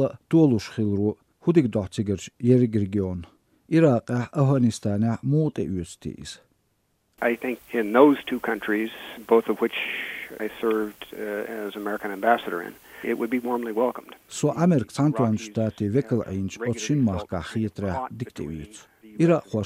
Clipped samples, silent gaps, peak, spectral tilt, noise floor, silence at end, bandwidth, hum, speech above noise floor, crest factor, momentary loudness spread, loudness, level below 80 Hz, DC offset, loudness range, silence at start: under 0.1%; none; -4 dBFS; -7 dB/octave; -70 dBFS; 0 s; 16 kHz; none; 46 dB; 20 dB; 14 LU; -24 LUFS; -56 dBFS; under 0.1%; 4 LU; 0 s